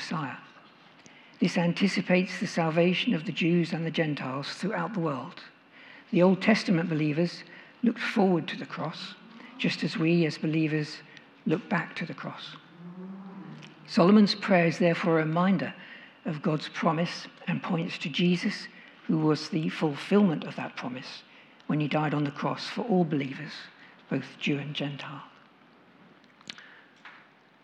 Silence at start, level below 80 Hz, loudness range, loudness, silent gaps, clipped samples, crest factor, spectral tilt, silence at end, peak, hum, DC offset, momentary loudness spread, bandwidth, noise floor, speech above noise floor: 0 s; -86 dBFS; 7 LU; -28 LUFS; none; under 0.1%; 20 dB; -6.5 dB/octave; 0.45 s; -8 dBFS; none; under 0.1%; 20 LU; 10 kHz; -57 dBFS; 30 dB